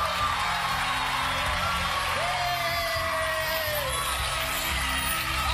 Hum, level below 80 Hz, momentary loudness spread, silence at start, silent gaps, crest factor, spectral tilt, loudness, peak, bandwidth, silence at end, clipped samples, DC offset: none; -40 dBFS; 1 LU; 0 s; none; 14 dB; -2 dB/octave; -26 LUFS; -14 dBFS; 15 kHz; 0 s; under 0.1%; under 0.1%